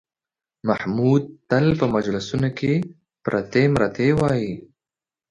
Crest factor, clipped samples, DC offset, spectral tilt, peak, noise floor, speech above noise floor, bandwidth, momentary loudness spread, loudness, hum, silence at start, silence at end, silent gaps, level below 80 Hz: 18 dB; under 0.1%; under 0.1%; -7.5 dB/octave; -4 dBFS; under -90 dBFS; over 70 dB; 10.5 kHz; 10 LU; -21 LUFS; none; 0.65 s; 0.7 s; none; -50 dBFS